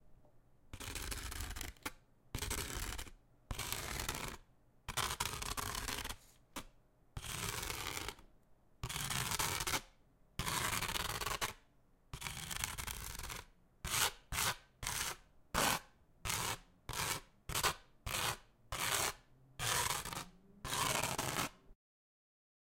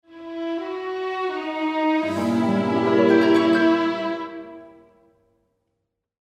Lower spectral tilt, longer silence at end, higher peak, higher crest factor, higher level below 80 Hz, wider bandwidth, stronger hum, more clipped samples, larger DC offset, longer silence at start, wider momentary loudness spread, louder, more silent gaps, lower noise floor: second, -1.5 dB/octave vs -6.5 dB/octave; second, 1 s vs 1.55 s; second, -12 dBFS vs -6 dBFS; first, 30 dB vs 18 dB; first, -54 dBFS vs -72 dBFS; first, 17 kHz vs 9.6 kHz; neither; neither; neither; about the same, 0.05 s vs 0.1 s; about the same, 15 LU vs 15 LU; second, -40 LUFS vs -21 LUFS; neither; second, -69 dBFS vs -78 dBFS